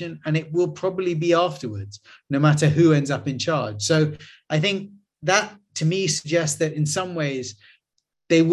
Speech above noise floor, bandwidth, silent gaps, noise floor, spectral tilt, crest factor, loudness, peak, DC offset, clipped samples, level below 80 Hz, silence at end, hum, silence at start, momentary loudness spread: 54 dB; 12.5 kHz; none; -76 dBFS; -5 dB/octave; 18 dB; -22 LUFS; -4 dBFS; under 0.1%; under 0.1%; -58 dBFS; 0 s; none; 0 s; 14 LU